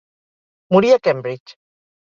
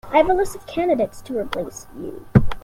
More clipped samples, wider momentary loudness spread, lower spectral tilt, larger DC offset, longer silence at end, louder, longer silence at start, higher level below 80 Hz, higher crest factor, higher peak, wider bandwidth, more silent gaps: neither; about the same, 16 LU vs 16 LU; about the same, -6.5 dB/octave vs -7 dB/octave; neither; first, 0.65 s vs 0.05 s; first, -16 LUFS vs -21 LUFS; first, 0.7 s vs 0.05 s; second, -60 dBFS vs -34 dBFS; about the same, 18 dB vs 20 dB; about the same, -2 dBFS vs 0 dBFS; second, 7.4 kHz vs 15.5 kHz; first, 1.40-1.46 s vs none